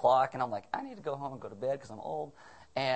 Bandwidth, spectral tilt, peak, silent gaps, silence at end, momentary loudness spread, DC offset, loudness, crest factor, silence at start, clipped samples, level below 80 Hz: 8.4 kHz; -5.5 dB/octave; -14 dBFS; none; 0 s; 12 LU; under 0.1%; -35 LUFS; 20 dB; 0 s; under 0.1%; -70 dBFS